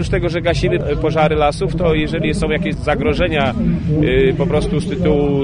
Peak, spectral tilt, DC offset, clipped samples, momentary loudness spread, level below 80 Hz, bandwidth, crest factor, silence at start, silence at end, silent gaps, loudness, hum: -2 dBFS; -7 dB/octave; under 0.1%; under 0.1%; 4 LU; -26 dBFS; 10 kHz; 12 dB; 0 s; 0 s; none; -16 LUFS; none